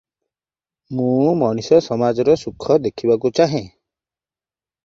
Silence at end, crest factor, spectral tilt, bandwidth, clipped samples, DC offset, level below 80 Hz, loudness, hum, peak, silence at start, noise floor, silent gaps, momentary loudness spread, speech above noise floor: 1.15 s; 18 dB; -7 dB/octave; 7.6 kHz; under 0.1%; under 0.1%; -54 dBFS; -18 LUFS; none; -2 dBFS; 0.9 s; under -90 dBFS; none; 4 LU; over 73 dB